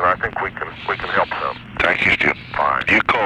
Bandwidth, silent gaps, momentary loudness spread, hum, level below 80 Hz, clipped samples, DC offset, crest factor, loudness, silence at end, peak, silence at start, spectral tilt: 12 kHz; none; 10 LU; none; -44 dBFS; under 0.1%; under 0.1%; 18 dB; -18 LUFS; 0 s; -2 dBFS; 0 s; -5 dB/octave